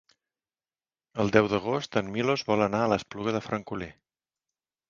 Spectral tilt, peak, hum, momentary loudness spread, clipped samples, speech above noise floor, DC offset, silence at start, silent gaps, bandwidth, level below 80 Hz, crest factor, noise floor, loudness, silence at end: -6 dB/octave; -4 dBFS; none; 14 LU; under 0.1%; over 63 dB; under 0.1%; 1.15 s; none; 7.6 kHz; -58 dBFS; 26 dB; under -90 dBFS; -27 LUFS; 1 s